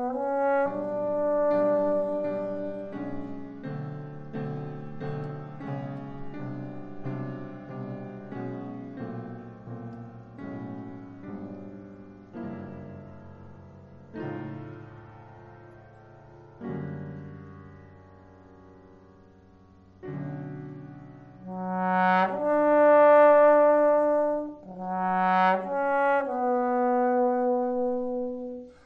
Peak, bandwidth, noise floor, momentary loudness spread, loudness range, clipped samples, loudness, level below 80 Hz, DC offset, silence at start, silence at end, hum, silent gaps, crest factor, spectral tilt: -10 dBFS; 5.2 kHz; -54 dBFS; 22 LU; 22 LU; under 0.1%; -26 LUFS; -60 dBFS; under 0.1%; 0 s; 0.15 s; none; none; 18 dB; -9 dB/octave